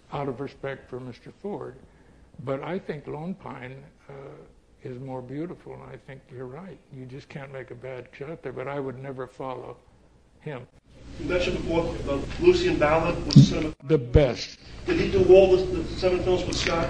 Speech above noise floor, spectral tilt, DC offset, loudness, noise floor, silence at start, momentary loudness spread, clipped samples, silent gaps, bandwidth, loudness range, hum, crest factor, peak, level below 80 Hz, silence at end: 32 dB; -6.5 dB/octave; under 0.1%; -24 LUFS; -57 dBFS; 0.1 s; 23 LU; under 0.1%; none; 9.2 kHz; 19 LU; none; 24 dB; -2 dBFS; -40 dBFS; 0 s